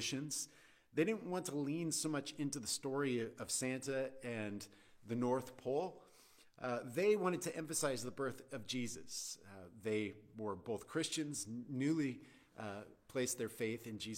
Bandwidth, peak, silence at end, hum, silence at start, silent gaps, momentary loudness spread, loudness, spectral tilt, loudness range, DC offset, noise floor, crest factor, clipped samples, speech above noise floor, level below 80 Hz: 16.5 kHz; -24 dBFS; 0 s; none; 0 s; none; 11 LU; -41 LUFS; -4 dB/octave; 3 LU; under 0.1%; -66 dBFS; 18 dB; under 0.1%; 25 dB; -78 dBFS